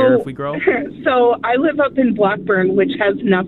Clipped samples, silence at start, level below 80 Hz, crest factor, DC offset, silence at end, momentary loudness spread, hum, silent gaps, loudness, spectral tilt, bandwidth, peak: under 0.1%; 0 s; -54 dBFS; 14 dB; under 0.1%; 0 s; 3 LU; none; none; -16 LUFS; -8.5 dB/octave; 4.2 kHz; -2 dBFS